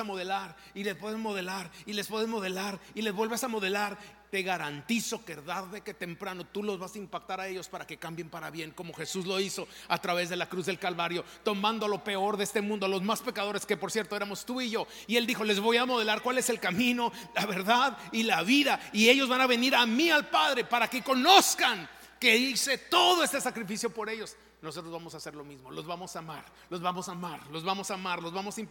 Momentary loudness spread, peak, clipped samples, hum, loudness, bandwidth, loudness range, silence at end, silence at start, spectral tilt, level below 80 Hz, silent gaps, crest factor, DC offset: 16 LU; -4 dBFS; under 0.1%; none; -29 LUFS; 17 kHz; 13 LU; 0 s; 0 s; -2.5 dB/octave; -68 dBFS; none; 26 dB; under 0.1%